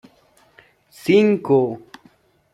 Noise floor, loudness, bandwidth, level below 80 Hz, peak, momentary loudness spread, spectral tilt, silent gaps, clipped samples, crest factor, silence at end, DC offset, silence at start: -56 dBFS; -18 LUFS; 12.5 kHz; -64 dBFS; -4 dBFS; 14 LU; -7 dB/octave; none; under 0.1%; 16 dB; 0.75 s; under 0.1%; 1.05 s